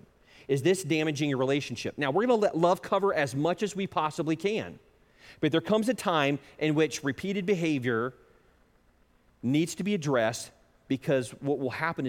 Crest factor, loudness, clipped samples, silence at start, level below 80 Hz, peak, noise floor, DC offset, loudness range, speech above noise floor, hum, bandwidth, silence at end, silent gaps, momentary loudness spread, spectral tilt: 18 dB; -28 LUFS; under 0.1%; 0.5 s; -66 dBFS; -10 dBFS; -64 dBFS; under 0.1%; 4 LU; 36 dB; none; 16.5 kHz; 0 s; none; 7 LU; -5.5 dB/octave